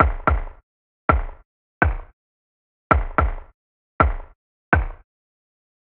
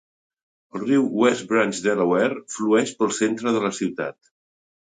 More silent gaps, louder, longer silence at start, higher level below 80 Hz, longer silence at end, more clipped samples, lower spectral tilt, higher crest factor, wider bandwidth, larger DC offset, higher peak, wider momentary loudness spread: first, 0.63-1.08 s, 1.45-1.81 s, 2.13-2.90 s, 3.54-3.99 s, 4.35-4.72 s vs none; about the same, -22 LUFS vs -22 LUFS; second, 0 s vs 0.75 s; first, -28 dBFS vs -68 dBFS; first, 0.9 s vs 0.75 s; neither; first, -6.5 dB/octave vs -4.5 dB/octave; first, 24 dB vs 18 dB; second, 4.2 kHz vs 9.6 kHz; neither; first, 0 dBFS vs -4 dBFS; first, 17 LU vs 9 LU